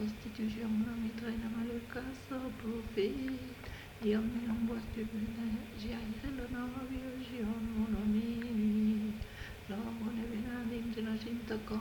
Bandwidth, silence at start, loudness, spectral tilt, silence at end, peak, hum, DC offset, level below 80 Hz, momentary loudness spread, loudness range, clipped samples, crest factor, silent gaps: 19 kHz; 0 s; -38 LUFS; -6.5 dB/octave; 0 s; -22 dBFS; none; under 0.1%; -52 dBFS; 9 LU; 3 LU; under 0.1%; 16 dB; none